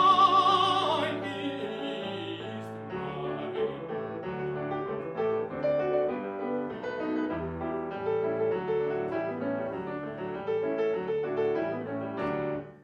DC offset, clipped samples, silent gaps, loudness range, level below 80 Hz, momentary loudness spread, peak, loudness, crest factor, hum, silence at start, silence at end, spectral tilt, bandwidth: under 0.1%; under 0.1%; none; 4 LU; -62 dBFS; 10 LU; -10 dBFS; -30 LUFS; 20 dB; none; 0 s; 0 s; -6 dB/octave; 9.6 kHz